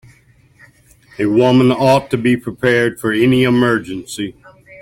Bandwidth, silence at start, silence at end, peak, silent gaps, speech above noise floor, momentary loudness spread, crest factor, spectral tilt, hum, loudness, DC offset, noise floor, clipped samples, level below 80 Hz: 16.5 kHz; 1.2 s; 0.05 s; -2 dBFS; none; 36 dB; 13 LU; 14 dB; -6.5 dB/octave; none; -14 LUFS; under 0.1%; -50 dBFS; under 0.1%; -50 dBFS